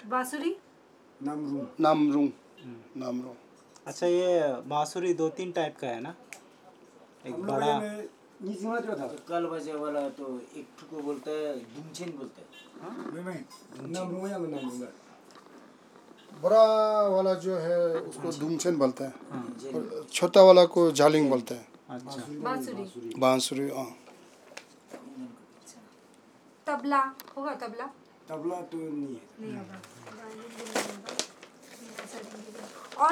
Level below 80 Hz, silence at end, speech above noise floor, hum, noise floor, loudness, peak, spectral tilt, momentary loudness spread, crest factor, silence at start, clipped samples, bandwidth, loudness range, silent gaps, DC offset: under -90 dBFS; 0 s; 30 dB; none; -58 dBFS; -28 LUFS; -4 dBFS; -5 dB/octave; 22 LU; 26 dB; 0 s; under 0.1%; 16 kHz; 15 LU; none; under 0.1%